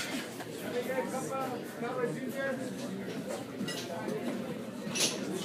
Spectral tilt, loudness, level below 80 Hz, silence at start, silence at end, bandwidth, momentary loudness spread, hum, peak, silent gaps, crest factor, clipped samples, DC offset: -3.5 dB/octave; -36 LUFS; -76 dBFS; 0 s; 0 s; 15.5 kHz; 8 LU; none; -14 dBFS; none; 22 dB; under 0.1%; under 0.1%